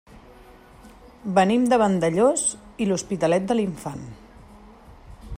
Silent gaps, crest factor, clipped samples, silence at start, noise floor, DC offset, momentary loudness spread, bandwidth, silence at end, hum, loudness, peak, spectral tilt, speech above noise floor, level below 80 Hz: none; 18 dB; under 0.1%; 0.15 s; -48 dBFS; under 0.1%; 16 LU; 15.5 kHz; 0 s; none; -22 LUFS; -6 dBFS; -5 dB/octave; 26 dB; -48 dBFS